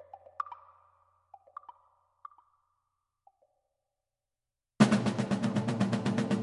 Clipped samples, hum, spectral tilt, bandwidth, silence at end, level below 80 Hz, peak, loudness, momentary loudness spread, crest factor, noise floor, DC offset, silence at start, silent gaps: under 0.1%; none; -6.5 dB/octave; 11.5 kHz; 0 s; -66 dBFS; -8 dBFS; -30 LUFS; 25 LU; 26 dB; -89 dBFS; under 0.1%; 0.15 s; none